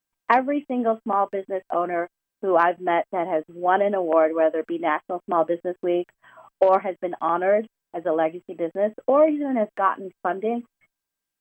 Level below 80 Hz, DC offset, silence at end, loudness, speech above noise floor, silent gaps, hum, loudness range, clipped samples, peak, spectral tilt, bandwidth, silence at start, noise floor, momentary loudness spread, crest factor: -80 dBFS; under 0.1%; 0.8 s; -23 LUFS; 62 dB; none; none; 2 LU; under 0.1%; -4 dBFS; -8 dB/octave; 5.2 kHz; 0.3 s; -84 dBFS; 9 LU; 20 dB